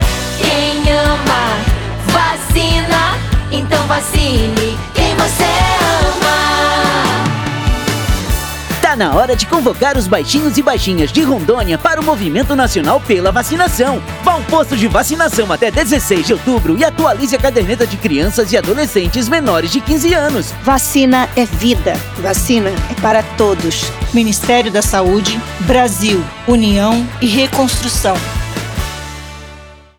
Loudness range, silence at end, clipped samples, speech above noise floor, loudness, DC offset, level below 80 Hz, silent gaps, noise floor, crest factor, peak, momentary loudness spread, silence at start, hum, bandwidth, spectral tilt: 1 LU; 0.25 s; under 0.1%; 23 dB; -13 LUFS; under 0.1%; -24 dBFS; none; -35 dBFS; 12 dB; 0 dBFS; 5 LU; 0 s; none; over 20 kHz; -4.5 dB/octave